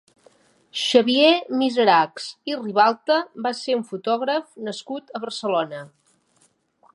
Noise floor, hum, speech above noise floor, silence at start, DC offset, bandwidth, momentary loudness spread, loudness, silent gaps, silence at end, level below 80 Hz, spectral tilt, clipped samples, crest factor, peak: -63 dBFS; none; 42 dB; 0.75 s; under 0.1%; 11.5 kHz; 15 LU; -21 LUFS; none; 1.05 s; -78 dBFS; -4 dB/octave; under 0.1%; 20 dB; -2 dBFS